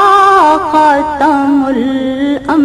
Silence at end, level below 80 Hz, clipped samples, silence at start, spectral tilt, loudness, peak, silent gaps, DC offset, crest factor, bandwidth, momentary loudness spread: 0 s; -40 dBFS; under 0.1%; 0 s; -5 dB/octave; -10 LUFS; 0 dBFS; none; under 0.1%; 8 dB; 12.5 kHz; 8 LU